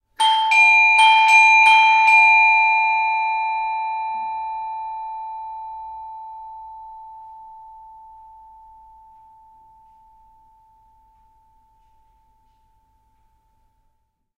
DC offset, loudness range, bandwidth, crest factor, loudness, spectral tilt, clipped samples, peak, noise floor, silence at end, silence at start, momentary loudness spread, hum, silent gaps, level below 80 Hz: under 0.1%; 25 LU; 10.5 kHz; 18 dB; -14 LUFS; 2.5 dB/octave; under 0.1%; -2 dBFS; -68 dBFS; 6.85 s; 0.2 s; 25 LU; none; none; -62 dBFS